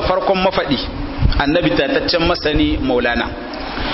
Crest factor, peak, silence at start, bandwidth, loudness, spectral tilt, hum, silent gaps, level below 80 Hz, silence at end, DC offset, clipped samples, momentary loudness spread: 14 dB; -2 dBFS; 0 s; 6 kHz; -17 LUFS; -8.5 dB/octave; none; none; -26 dBFS; 0 s; under 0.1%; under 0.1%; 8 LU